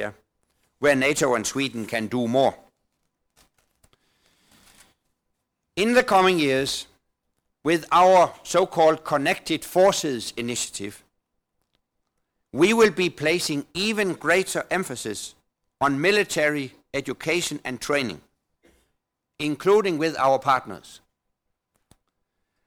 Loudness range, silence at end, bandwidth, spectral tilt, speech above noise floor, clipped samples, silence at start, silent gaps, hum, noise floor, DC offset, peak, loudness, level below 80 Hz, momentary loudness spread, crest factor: 7 LU; 1.7 s; 19.5 kHz; -4 dB/octave; 56 dB; under 0.1%; 0 s; none; none; -78 dBFS; under 0.1%; -10 dBFS; -22 LUFS; -60 dBFS; 13 LU; 16 dB